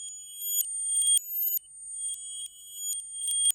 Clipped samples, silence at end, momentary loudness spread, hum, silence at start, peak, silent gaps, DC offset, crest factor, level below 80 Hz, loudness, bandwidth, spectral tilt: under 0.1%; 0 s; 15 LU; none; 0 s; -6 dBFS; none; under 0.1%; 26 dB; -80 dBFS; -27 LUFS; 17 kHz; 6 dB/octave